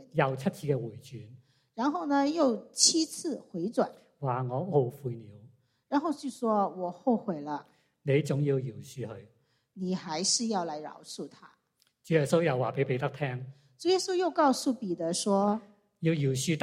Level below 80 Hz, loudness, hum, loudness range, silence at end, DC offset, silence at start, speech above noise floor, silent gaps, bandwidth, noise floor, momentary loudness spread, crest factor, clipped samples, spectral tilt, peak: -72 dBFS; -30 LUFS; none; 4 LU; 0 s; under 0.1%; 0 s; 43 dB; none; 15.5 kHz; -73 dBFS; 15 LU; 22 dB; under 0.1%; -4.5 dB/octave; -8 dBFS